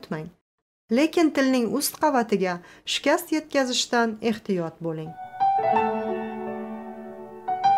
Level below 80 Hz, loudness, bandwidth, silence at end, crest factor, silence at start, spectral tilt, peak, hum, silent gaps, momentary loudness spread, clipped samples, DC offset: -66 dBFS; -24 LUFS; 16 kHz; 0 s; 16 dB; 0 s; -4 dB/octave; -10 dBFS; none; 0.41-0.88 s; 15 LU; under 0.1%; under 0.1%